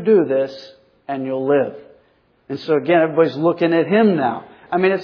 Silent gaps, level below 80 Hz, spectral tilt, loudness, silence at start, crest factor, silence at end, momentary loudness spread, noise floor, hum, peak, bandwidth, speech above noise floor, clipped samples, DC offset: none; -68 dBFS; -8.5 dB/octave; -18 LUFS; 0 s; 14 dB; 0 s; 14 LU; -58 dBFS; none; -4 dBFS; 5.4 kHz; 41 dB; under 0.1%; under 0.1%